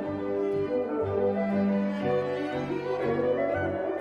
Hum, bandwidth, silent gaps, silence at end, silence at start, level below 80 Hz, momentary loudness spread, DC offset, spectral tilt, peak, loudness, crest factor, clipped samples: none; 7 kHz; none; 0 s; 0 s; -60 dBFS; 4 LU; under 0.1%; -8.5 dB/octave; -16 dBFS; -28 LUFS; 12 dB; under 0.1%